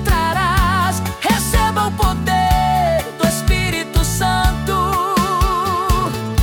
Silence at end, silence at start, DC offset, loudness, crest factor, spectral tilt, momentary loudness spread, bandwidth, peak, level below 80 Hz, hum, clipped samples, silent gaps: 0 s; 0 s; under 0.1%; -17 LUFS; 12 dB; -4.5 dB/octave; 3 LU; 18 kHz; -4 dBFS; -22 dBFS; none; under 0.1%; none